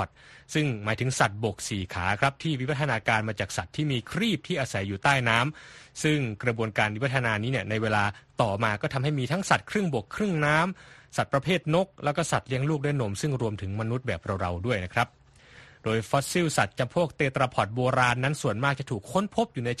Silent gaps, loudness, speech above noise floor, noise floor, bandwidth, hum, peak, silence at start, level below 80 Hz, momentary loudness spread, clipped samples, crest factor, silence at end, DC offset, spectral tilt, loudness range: none; -27 LUFS; 26 dB; -53 dBFS; 12.5 kHz; none; -6 dBFS; 0 s; -54 dBFS; 7 LU; under 0.1%; 22 dB; 0.05 s; under 0.1%; -5 dB/octave; 2 LU